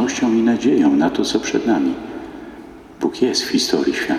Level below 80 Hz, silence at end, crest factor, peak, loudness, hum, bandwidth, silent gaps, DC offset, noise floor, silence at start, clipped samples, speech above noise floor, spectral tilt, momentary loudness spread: -52 dBFS; 0 s; 16 dB; -2 dBFS; -18 LUFS; none; 14 kHz; none; under 0.1%; -38 dBFS; 0 s; under 0.1%; 21 dB; -4 dB/octave; 18 LU